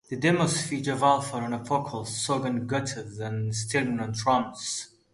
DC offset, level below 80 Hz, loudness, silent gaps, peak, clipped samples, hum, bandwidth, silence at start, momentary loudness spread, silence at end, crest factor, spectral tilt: under 0.1%; -62 dBFS; -27 LUFS; none; -8 dBFS; under 0.1%; none; 11.5 kHz; 0.1 s; 9 LU; 0.25 s; 20 dB; -4.5 dB/octave